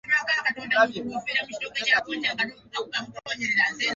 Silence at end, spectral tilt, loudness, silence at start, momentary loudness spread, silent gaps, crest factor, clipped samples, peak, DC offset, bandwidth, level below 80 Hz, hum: 0 s; -2 dB/octave; -25 LUFS; 0.05 s; 9 LU; none; 20 dB; under 0.1%; -8 dBFS; under 0.1%; 8 kHz; -66 dBFS; none